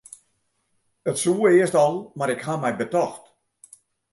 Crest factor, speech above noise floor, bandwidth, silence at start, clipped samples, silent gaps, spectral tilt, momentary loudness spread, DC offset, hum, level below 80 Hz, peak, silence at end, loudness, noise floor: 18 dB; 50 dB; 11.5 kHz; 1.05 s; under 0.1%; none; -5 dB/octave; 11 LU; under 0.1%; none; -70 dBFS; -6 dBFS; 0.95 s; -22 LUFS; -71 dBFS